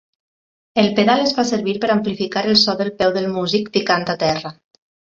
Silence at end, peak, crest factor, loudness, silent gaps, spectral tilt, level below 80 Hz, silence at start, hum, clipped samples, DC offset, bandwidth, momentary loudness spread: 0.6 s; 0 dBFS; 18 dB; -18 LUFS; none; -4.5 dB/octave; -56 dBFS; 0.75 s; none; under 0.1%; under 0.1%; 7.6 kHz; 7 LU